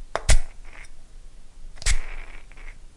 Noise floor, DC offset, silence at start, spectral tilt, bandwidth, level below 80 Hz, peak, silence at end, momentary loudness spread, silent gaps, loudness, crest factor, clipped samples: -40 dBFS; under 0.1%; 0 s; -2.5 dB/octave; 11.5 kHz; -26 dBFS; -6 dBFS; 0.1 s; 24 LU; none; -26 LUFS; 18 dB; under 0.1%